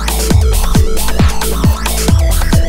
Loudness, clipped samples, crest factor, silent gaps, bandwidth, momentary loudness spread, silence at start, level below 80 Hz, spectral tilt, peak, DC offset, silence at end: -13 LUFS; under 0.1%; 10 dB; none; 16.5 kHz; 2 LU; 0 s; -12 dBFS; -5 dB/octave; 0 dBFS; under 0.1%; 0 s